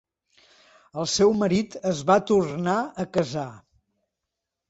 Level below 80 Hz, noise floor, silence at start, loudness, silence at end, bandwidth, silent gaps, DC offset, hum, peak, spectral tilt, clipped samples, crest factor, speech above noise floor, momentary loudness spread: -60 dBFS; -84 dBFS; 0.95 s; -24 LUFS; 1.1 s; 8 kHz; none; under 0.1%; none; -6 dBFS; -5 dB/octave; under 0.1%; 20 dB; 61 dB; 11 LU